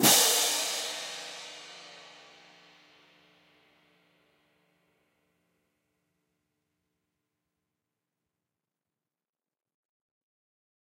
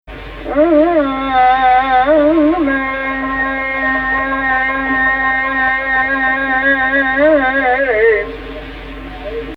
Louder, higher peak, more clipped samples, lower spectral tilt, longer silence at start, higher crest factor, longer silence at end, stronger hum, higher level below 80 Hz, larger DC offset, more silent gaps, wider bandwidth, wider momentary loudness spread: second, -25 LUFS vs -13 LUFS; second, -8 dBFS vs -2 dBFS; neither; second, -0.5 dB/octave vs -7 dB/octave; about the same, 0 s vs 0.05 s; first, 28 dB vs 12 dB; first, 8.8 s vs 0 s; neither; second, -86 dBFS vs -34 dBFS; neither; neither; first, 16 kHz vs 5.8 kHz; first, 28 LU vs 15 LU